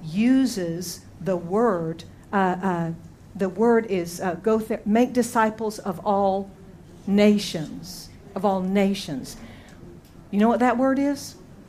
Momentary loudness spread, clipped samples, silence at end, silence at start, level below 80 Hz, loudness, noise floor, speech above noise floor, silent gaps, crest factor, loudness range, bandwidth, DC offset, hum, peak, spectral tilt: 17 LU; under 0.1%; 0.05 s; 0 s; -54 dBFS; -23 LUFS; -45 dBFS; 22 dB; none; 18 dB; 2 LU; 15.5 kHz; under 0.1%; none; -6 dBFS; -6 dB/octave